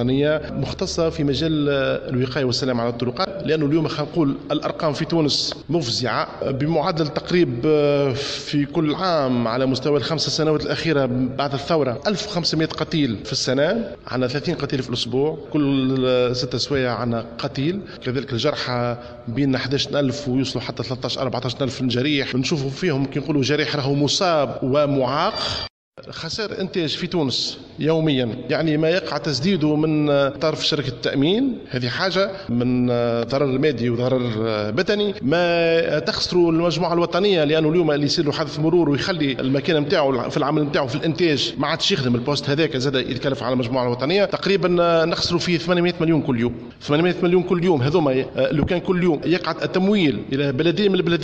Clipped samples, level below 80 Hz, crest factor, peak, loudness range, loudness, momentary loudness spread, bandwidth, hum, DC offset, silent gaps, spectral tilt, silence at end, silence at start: under 0.1%; -48 dBFS; 16 dB; -6 dBFS; 3 LU; -21 LUFS; 6 LU; 8.8 kHz; none; under 0.1%; 25.70-25.92 s; -5.5 dB/octave; 0 s; 0 s